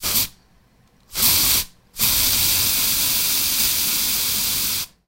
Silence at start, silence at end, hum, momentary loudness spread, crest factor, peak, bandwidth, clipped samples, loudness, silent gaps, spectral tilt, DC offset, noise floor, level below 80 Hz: 0 s; 0.2 s; none; 5 LU; 20 dB; -2 dBFS; 16.5 kHz; under 0.1%; -17 LUFS; none; 0 dB/octave; under 0.1%; -56 dBFS; -42 dBFS